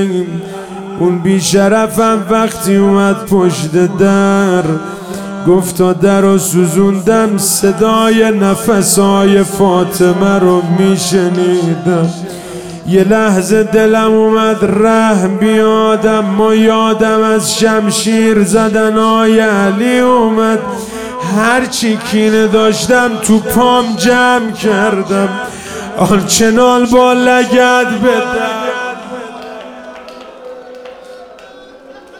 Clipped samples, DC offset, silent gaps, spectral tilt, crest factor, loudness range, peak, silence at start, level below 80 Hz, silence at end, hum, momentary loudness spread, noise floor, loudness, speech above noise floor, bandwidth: under 0.1%; 0.8%; none; -5 dB/octave; 10 dB; 2 LU; 0 dBFS; 0 s; -42 dBFS; 0 s; none; 14 LU; -35 dBFS; -10 LUFS; 25 dB; 17.5 kHz